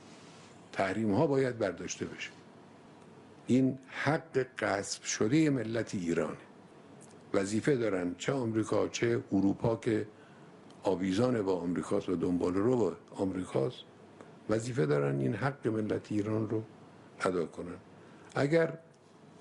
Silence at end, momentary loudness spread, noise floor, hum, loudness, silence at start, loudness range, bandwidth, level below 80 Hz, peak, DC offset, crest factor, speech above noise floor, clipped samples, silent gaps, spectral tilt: 0.6 s; 12 LU; -57 dBFS; none; -32 LUFS; 0 s; 3 LU; 11.5 kHz; -68 dBFS; -14 dBFS; under 0.1%; 18 dB; 26 dB; under 0.1%; none; -6 dB/octave